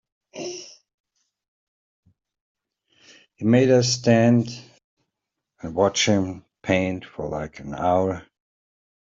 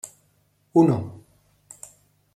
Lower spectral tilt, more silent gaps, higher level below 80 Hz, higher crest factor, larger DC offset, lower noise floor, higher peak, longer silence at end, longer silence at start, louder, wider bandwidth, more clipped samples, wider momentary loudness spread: second, -5 dB/octave vs -8 dB/octave; first, 0.94-1.04 s, 1.48-2.03 s, 2.41-2.55 s, 4.84-4.97 s vs none; first, -58 dBFS vs -66 dBFS; about the same, 20 dB vs 22 dB; neither; first, -83 dBFS vs -65 dBFS; about the same, -4 dBFS vs -4 dBFS; second, 0.8 s vs 1.2 s; first, 0.35 s vs 0.05 s; about the same, -21 LUFS vs -21 LUFS; second, 7.8 kHz vs 13 kHz; neither; second, 18 LU vs 24 LU